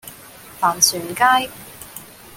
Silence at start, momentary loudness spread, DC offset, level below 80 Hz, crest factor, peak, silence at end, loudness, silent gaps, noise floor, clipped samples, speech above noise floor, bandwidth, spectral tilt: 0.05 s; 23 LU; under 0.1%; -56 dBFS; 22 dB; 0 dBFS; 0 s; -17 LUFS; none; -41 dBFS; under 0.1%; 23 dB; 17 kHz; -0.5 dB/octave